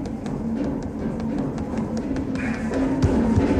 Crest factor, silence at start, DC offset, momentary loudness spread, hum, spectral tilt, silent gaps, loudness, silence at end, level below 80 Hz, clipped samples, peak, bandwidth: 16 dB; 0 s; under 0.1%; 8 LU; none; -8 dB/octave; none; -25 LUFS; 0 s; -36 dBFS; under 0.1%; -6 dBFS; 10.5 kHz